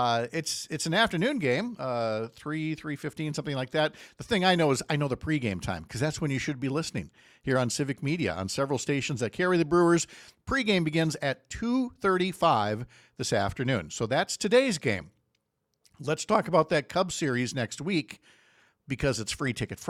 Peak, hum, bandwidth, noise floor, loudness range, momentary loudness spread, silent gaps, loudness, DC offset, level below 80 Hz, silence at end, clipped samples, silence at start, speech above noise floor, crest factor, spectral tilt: -10 dBFS; none; 15 kHz; -78 dBFS; 3 LU; 10 LU; none; -28 LUFS; under 0.1%; -56 dBFS; 0 s; under 0.1%; 0 s; 49 dB; 20 dB; -5 dB/octave